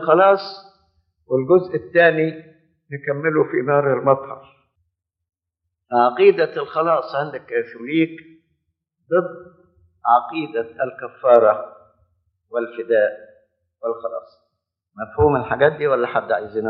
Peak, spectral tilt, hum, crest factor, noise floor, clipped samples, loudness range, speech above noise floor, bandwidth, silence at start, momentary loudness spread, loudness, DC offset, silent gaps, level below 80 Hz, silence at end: 0 dBFS; -4.5 dB/octave; none; 20 dB; -80 dBFS; under 0.1%; 5 LU; 61 dB; 5.8 kHz; 0 s; 16 LU; -19 LUFS; under 0.1%; none; -52 dBFS; 0 s